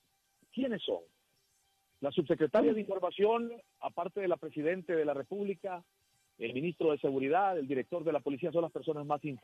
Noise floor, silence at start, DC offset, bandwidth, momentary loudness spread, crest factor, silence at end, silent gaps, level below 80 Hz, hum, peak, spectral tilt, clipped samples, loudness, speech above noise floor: -75 dBFS; 0.55 s; under 0.1%; 9.2 kHz; 11 LU; 16 dB; 0.05 s; none; -78 dBFS; none; -18 dBFS; -7.5 dB/octave; under 0.1%; -34 LUFS; 42 dB